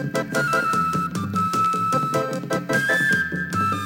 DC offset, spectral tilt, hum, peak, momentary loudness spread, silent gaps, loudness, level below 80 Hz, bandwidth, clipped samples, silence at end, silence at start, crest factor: under 0.1%; -5 dB/octave; none; -10 dBFS; 6 LU; none; -21 LUFS; -54 dBFS; 18 kHz; under 0.1%; 0 s; 0 s; 12 dB